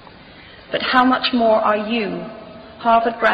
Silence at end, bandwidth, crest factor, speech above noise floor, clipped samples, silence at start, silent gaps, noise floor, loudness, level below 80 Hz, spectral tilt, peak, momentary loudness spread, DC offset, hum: 0 s; 5.6 kHz; 16 dB; 25 dB; under 0.1%; 0.25 s; none; -42 dBFS; -17 LUFS; -54 dBFS; -6.5 dB/octave; -2 dBFS; 17 LU; under 0.1%; none